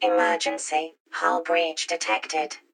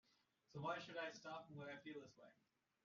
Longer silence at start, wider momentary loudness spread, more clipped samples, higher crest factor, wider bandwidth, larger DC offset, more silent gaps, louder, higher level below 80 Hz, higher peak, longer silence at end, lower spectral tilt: second, 0 s vs 0.5 s; second, 7 LU vs 12 LU; neither; about the same, 18 dB vs 20 dB; first, 16.5 kHz vs 7.2 kHz; neither; first, 1.00-1.05 s vs none; first, -25 LUFS vs -52 LUFS; about the same, under -90 dBFS vs under -90 dBFS; first, -8 dBFS vs -34 dBFS; second, 0.15 s vs 0.5 s; second, 0 dB/octave vs -3.5 dB/octave